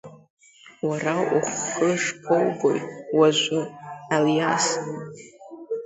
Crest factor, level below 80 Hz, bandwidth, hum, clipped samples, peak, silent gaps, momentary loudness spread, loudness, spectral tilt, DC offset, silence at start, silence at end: 18 dB; -68 dBFS; 8.2 kHz; none; under 0.1%; -6 dBFS; 0.30-0.37 s; 17 LU; -23 LUFS; -4 dB/octave; under 0.1%; 0.05 s; 0 s